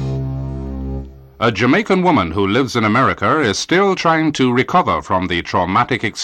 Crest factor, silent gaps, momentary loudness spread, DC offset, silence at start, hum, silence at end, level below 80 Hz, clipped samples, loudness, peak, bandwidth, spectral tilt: 14 dB; none; 11 LU; under 0.1%; 0 s; none; 0 s; -36 dBFS; under 0.1%; -16 LUFS; -4 dBFS; 13 kHz; -5.5 dB/octave